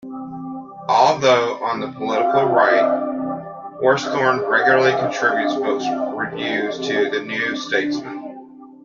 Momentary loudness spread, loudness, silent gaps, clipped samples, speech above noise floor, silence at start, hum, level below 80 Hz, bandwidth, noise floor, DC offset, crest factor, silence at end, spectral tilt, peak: 16 LU; -19 LUFS; none; under 0.1%; 21 dB; 0.05 s; none; -64 dBFS; 7.4 kHz; -40 dBFS; under 0.1%; 18 dB; 0.1 s; -4.5 dB/octave; -2 dBFS